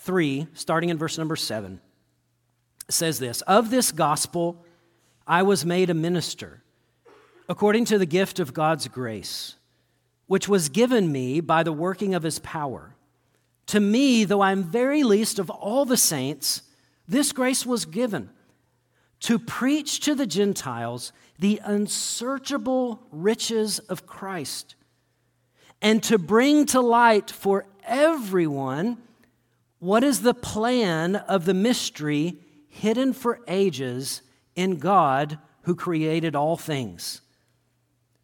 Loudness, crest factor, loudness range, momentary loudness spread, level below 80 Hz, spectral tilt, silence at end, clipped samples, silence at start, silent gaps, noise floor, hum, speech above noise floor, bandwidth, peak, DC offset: -23 LUFS; 20 dB; 5 LU; 13 LU; -64 dBFS; -4 dB/octave; 1.05 s; under 0.1%; 0 s; none; -70 dBFS; none; 47 dB; 17.5 kHz; -4 dBFS; under 0.1%